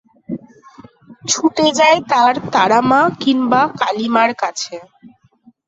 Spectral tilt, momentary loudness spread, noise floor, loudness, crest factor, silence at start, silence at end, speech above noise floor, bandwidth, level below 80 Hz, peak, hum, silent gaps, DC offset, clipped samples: -3 dB/octave; 18 LU; -51 dBFS; -14 LUFS; 16 dB; 0.3 s; 0.6 s; 37 dB; 8 kHz; -60 dBFS; 0 dBFS; none; none; under 0.1%; under 0.1%